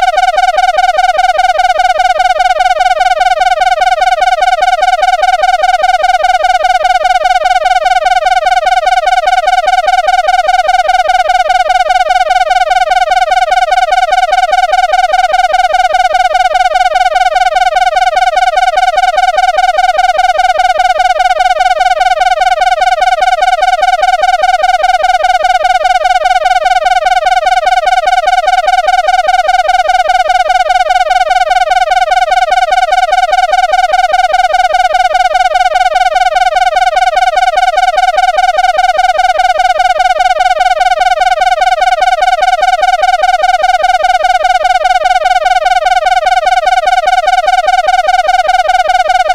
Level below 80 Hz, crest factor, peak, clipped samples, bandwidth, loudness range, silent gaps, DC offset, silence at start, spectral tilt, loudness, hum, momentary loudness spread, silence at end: -32 dBFS; 8 dB; 0 dBFS; under 0.1%; 13 kHz; 0 LU; none; 0.2%; 0 s; 0.5 dB/octave; -9 LUFS; none; 0 LU; 0 s